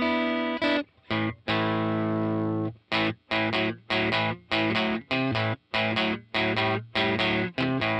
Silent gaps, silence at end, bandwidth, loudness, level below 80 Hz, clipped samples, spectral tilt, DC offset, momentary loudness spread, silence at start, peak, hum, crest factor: none; 0 s; 9 kHz; -26 LUFS; -58 dBFS; under 0.1%; -6.5 dB/octave; under 0.1%; 4 LU; 0 s; -12 dBFS; none; 14 dB